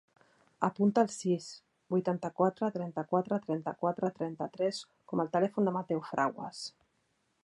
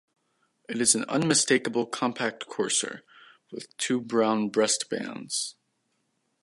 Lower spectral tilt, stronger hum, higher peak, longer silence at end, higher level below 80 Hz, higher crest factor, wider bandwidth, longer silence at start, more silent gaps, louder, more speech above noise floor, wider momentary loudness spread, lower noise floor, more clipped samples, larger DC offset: first, -6.5 dB/octave vs -2.5 dB/octave; neither; second, -12 dBFS vs -6 dBFS; second, 0.75 s vs 0.9 s; about the same, -78 dBFS vs -76 dBFS; about the same, 22 dB vs 22 dB; about the same, 11.5 kHz vs 11.5 kHz; about the same, 0.6 s vs 0.7 s; neither; second, -33 LUFS vs -26 LUFS; second, 44 dB vs 48 dB; second, 10 LU vs 14 LU; about the same, -76 dBFS vs -75 dBFS; neither; neither